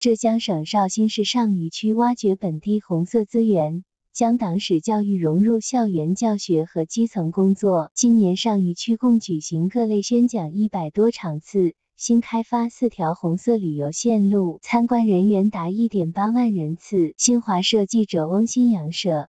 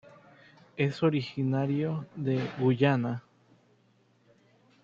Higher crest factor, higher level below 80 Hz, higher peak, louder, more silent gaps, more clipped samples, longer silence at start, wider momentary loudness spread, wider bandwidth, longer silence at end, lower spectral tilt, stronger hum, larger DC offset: second, 14 dB vs 20 dB; first, -64 dBFS vs -70 dBFS; first, -6 dBFS vs -10 dBFS; first, -21 LUFS vs -29 LUFS; first, 7.91-7.96 s vs none; neither; second, 0 s vs 0.75 s; second, 5 LU vs 9 LU; first, 9 kHz vs 7.2 kHz; second, 0.1 s vs 1.65 s; second, -5.5 dB/octave vs -8.5 dB/octave; second, none vs 60 Hz at -50 dBFS; neither